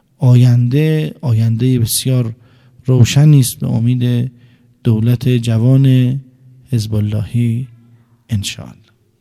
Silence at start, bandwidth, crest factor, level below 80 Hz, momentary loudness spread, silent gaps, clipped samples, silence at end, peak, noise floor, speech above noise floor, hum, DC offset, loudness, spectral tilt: 0.2 s; 15 kHz; 14 dB; -42 dBFS; 13 LU; none; under 0.1%; 0.5 s; 0 dBFS; -48 dBFS; 36 dB; none; under 0.1%; -14 LUFS; -6.5 dB/octave